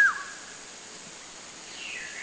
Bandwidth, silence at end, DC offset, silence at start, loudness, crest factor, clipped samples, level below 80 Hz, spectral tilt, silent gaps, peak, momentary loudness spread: 8 kHz; 0 s; under 0.1%; 0 s; -34 LUFS; 20 dB; under 0.1%; -70 dBFS; 0.5 dB/octave; none; -12 dBFS; 7 LU